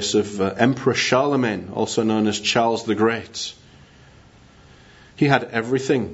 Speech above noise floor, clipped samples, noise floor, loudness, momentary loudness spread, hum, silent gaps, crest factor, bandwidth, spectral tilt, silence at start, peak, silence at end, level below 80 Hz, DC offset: 29 dB; under 0.1%; -49 dBFS; -21 LUFS; 7 LU; none; none; 22 dB; 8 kHz; -4.5 dB/octave; 0 s; 0 dBFS; 0 s; -58 dBFS; under 0.1%